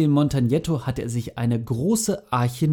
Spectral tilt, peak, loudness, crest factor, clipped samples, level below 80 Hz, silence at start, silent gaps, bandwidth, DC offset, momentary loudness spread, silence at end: -6.5 dB/octave; -8 dBFS; -23 LUFS; 14 dB; under 0.1%; -46 dBFS; 0 s; none; 18.5 kHz; under 0.1%; 6 LU; 0 s